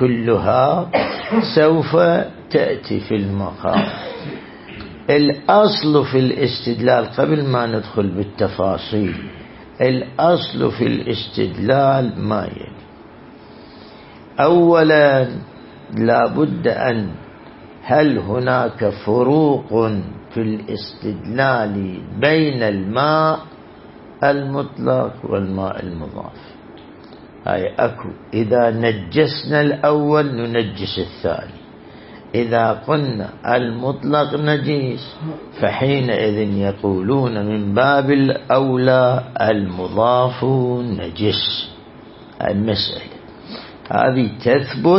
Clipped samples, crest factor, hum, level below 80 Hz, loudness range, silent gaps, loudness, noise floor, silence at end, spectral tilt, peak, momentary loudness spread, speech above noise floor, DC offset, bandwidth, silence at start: under 0.1%; 16 dB; none; -50 dBFS; 5 LU; none; -18 LUFS; -40 dBFS; 0 s; -11 dB/octave; 0 dBFS; 14 LU; 23 dB; under 0.1%; 5.8 kHz; 0 s